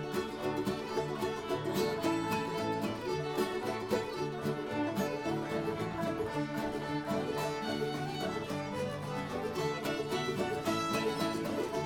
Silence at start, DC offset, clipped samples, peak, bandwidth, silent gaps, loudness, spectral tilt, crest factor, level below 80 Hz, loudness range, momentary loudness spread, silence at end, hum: 0 s; under 0.1%; under 0.1%; -20 dBFS; 18 kHz; none; -35 LUFS; -5.5 dB/octave; 16 dB; -62 dBFS; 1 LU; 4 LU; 0 s; none